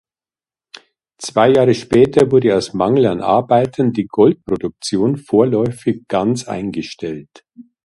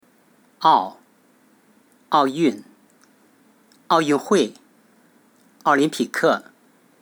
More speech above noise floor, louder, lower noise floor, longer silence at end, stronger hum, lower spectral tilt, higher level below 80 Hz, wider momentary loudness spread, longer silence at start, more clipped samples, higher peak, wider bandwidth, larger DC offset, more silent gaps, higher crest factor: first, over 75 dB vs 39 dB; first, -15 LUFS vs -20 LUFS; first, under -90 dBFS vs -57 dBFS; second, 0.2 s vs 0.6 s; neither; first, -6.5 dB/octave vs -4.5 dB/octave; first, -50 dBFS vs -84 dBFS; first, 12 LU vs 8 LU; first, 1.2 s vs 0.6 s; neither; about the same, 0 dBFS vs -2 dBFS; second, 11.5 kHz vs over 20 kHz; neither; neither; about the same, 16 dB vs 20 dB